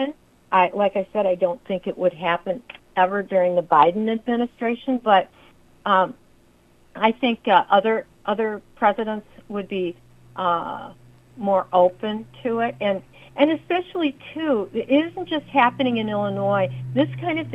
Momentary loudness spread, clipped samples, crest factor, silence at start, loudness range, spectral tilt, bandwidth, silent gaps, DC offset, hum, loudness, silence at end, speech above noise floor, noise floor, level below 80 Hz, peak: 11 LU; under 0.1%; 22 dB; 0 s; 4 LU; -7.5 dB/octave; 7.6 kHz; none; under 0.1%; 60 Hz at -60 dBFS; -22 LUFS; 0 s; 34 dB; -55 dBFS; -60 dBFS; 0 dBFS